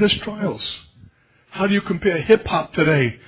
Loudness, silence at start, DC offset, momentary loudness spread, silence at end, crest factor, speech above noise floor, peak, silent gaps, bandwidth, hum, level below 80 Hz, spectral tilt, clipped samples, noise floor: -20 LUFS; 0 s; under 0.1%; 12 LU; 0.1 s; 18 dB; 32 dB; -2 dBFS; none; 4 kHz; none; -46 dBFS; -10 dB/octave; under 0.1%; -51 dBFS